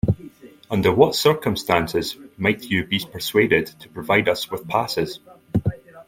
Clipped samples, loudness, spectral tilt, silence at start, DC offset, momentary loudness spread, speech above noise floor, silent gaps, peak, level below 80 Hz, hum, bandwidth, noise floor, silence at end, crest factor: under 0.1%; -21 LUFS; -5 dB/octave; 0.05 s; under 0.1%; 12 LU; 22 dB; none; 0 dBFS; -46 dBFS; none; 16.5 kHz; -43 dBFS; 0.05 s; 22 dB